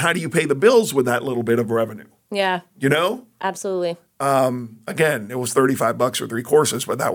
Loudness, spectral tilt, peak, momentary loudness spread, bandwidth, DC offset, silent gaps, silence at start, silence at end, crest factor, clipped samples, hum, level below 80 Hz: -20 LUFS; -4.5 dB/octave; -2 dBFS; 10 LU; 19 kHz; under 0.1%; none; 0 s; 0 s; 18 dB; under 0.1%; none; -66 dBFS